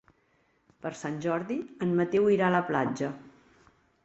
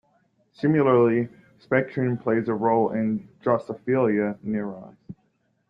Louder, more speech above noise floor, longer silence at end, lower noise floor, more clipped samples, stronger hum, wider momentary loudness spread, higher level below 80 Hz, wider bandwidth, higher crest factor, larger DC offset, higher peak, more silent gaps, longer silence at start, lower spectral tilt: second, -28 LUFS vs -24 LUFS; second, 41 dB vs 46 dB; first, 0.75 s vs 0.55 s; about the same, -69 dBFS vs -69 dBFS; neither; neither; first, 14 LU vs 10 LU; about the same, -68 dBFS vs -66 dBFS; first, 8.2 kHz vs 5.4 kHz; about the same, 18 dB vs 18 dB; neither; second, -12 dBFS vs -6 dBFS; neither; first, 0.85 s vs 0.6 s; second, -7 dB/octave vs -10.5 dB/octave